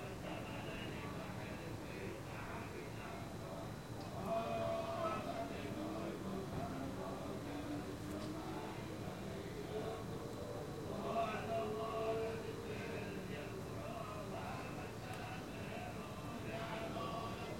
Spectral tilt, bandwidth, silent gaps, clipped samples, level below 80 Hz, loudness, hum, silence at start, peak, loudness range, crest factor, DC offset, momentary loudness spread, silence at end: -6 dB/octave; 16.5 kHz; none; under 0.1%; -62 dBFS; -45 LUFS; none; 0 s; -28 dBFS; 4 LU; 16 dB; under 0.1%; 7 LU; 0 s